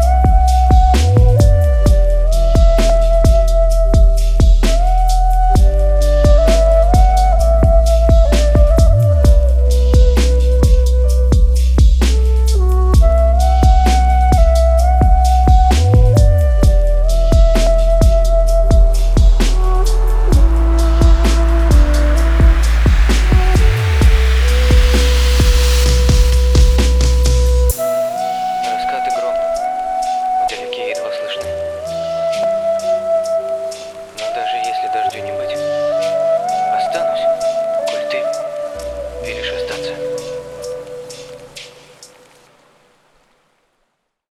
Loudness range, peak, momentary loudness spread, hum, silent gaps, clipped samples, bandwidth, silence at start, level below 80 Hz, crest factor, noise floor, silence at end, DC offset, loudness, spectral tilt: 7 LU; 0 dBFS; 10 LU; none; none; under 0.1%; 14.5 kHz; 0 s; -12 dBFS; 10 dB; -68 dBFS; 2.7 s; under 0.1%; -14 LUFS; -6 dB/octave